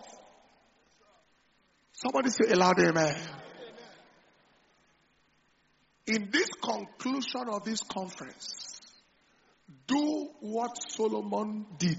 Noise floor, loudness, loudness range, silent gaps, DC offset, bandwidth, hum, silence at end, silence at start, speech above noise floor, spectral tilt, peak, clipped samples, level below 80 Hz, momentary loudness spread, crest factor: -69 dBFS; -30 LUFS; 7 LU; none; under 0.1%; 8 kHz; none; 0 s; 0 s; 40 dB; -3.5 dB/octave; -10 dBFS; under 0.1%; -72 dBFS; 23 LU; 22 dB